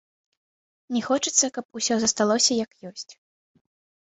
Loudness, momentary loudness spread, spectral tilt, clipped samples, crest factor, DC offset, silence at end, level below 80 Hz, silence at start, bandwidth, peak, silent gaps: -22 LUFS; 18 LU; -2 dB/octave; under 0.1%; 20 dB; under 0.1%; 1 s; -68 dBFS; 0.9 s; 8.4 kHz; -6 dBFS; 1.65-1.69 s